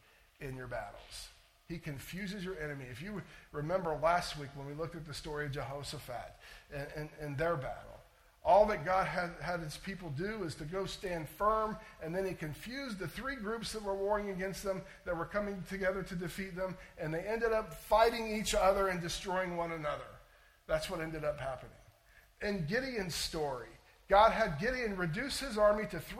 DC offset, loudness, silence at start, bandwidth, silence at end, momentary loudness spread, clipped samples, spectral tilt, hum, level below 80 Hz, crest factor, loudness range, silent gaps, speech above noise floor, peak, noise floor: under 0.1%; -36 LUFS; 0.4 s; 16.5 kHz; 0 s; 15 LU; under 0.1%; -4.5 dB/octave; none; -54 dBFS; 22 dB; 7 LU; none; 28 dB; -14 dBFS; -64 dBFS